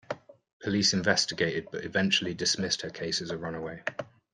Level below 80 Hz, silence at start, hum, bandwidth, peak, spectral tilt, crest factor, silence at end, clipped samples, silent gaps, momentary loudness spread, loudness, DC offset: -64 dBFS; 0.1 s; none; 11 kHz; -10 dBFS; -3 dB/octave; 22 dB; 0.3 s; under 0.1%; 0.53-0.60 s; 12 LU; -28 LUFS; under 0.1%